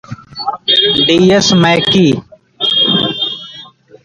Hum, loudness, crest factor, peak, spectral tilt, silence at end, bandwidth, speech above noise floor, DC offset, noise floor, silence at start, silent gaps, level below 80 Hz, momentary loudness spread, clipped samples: none; -10 LUFS; 12 dB; 0 dBFS; -4.5 dB/octave; 0.4 s; 10.5 kHz; 27 dB; under 0.1%; -36 dBFS; 0.1 s; none; -46 dBFS; 13 LU; under 0.1%